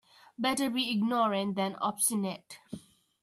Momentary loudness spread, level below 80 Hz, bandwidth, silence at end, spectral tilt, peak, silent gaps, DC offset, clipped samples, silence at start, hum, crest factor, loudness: 18 LU; -74 dBFS; 14 kHz; 0.45 s; -3.5 dB/octave; -14 dBFS; none; under 0.1%; under 0.1%; 0.4 s; none; 18 dB; -30 LUFS